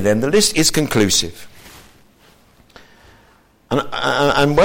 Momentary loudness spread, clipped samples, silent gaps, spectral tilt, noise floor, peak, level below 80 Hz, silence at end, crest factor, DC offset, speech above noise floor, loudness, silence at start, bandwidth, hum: 8 LU; under 0.1%; none; -3.5 dB/octave; -52 dBFS; -2 dBFS; -42 dBFS; 0 s; 16 dB; under 0.1%; 37 dB; -16 LUFS; 0 s; 17 kHz; none